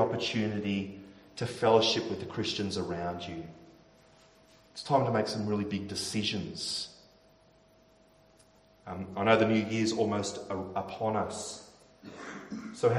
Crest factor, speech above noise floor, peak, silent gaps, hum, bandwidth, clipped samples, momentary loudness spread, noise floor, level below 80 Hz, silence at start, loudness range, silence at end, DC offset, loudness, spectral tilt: 26 dB; 32 dB; -6 dBFS; none; none; 13.5 kHz; under 0.1%; 19 LU; -62 dBFS; -66 dBFS; 0 s; 5 LU; 0 s; under 0.1%; -31 LUFS; -5 dB/octave